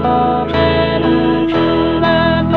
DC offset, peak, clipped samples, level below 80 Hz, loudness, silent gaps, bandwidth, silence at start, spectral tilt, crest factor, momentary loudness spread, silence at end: 1%; 0 dBFS; under 0.1%; -32 dBFS; -13 LUFS; none; 5.2 kHz; 0 s; -8.5 dB/octave; 12 dB; 2 LU; 0 s